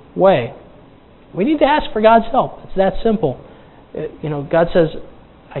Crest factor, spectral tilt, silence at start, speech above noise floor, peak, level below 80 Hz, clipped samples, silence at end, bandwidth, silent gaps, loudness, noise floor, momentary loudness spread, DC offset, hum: 16 dB; -10.5 dB/octave; 0.15 s; 29 dB; 0 dBFS; -36 dBFS; under 0.1%; 0 s; 4.2 kHz; none; -16 LUFS; -44 dBFS; 18 LU; under 0.1%; none